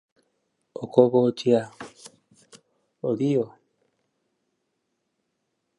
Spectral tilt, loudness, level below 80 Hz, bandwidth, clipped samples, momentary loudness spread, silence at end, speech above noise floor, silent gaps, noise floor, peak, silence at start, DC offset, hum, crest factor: -7.5 dB/octave; -23 LUFS; -74 dBFS; 11 kHz; under 0.1%; 22 LU; 2.3 s; 56 dB; none; -77 dBFS; -2 dBFS; 0.8 s; under 0.1%; none; 24 dB